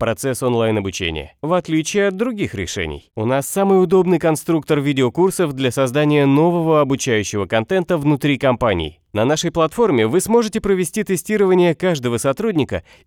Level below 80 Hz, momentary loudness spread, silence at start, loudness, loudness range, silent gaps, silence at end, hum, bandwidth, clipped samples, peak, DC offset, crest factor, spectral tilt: -44 dBFS; 8 LU; 0 s; -18 LUFS; 2 LU; none; 0.25 s; none; 18 kHz; under 0.1%; -2 dBFS; under 0.1%; 14 dB; -5.5 dB/octave